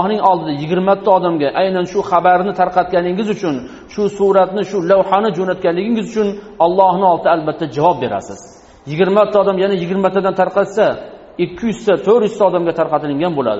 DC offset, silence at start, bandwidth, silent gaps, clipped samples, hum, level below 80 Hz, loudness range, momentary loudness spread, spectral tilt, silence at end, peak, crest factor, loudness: under 0.1%; 0 s; 8 kHz; none; under 0.1%; none; -50 dBFS; 1 LU; 8 LU; -5 dB/octave; 0 s; 0 dBFS; 14 dB; -15 LUFS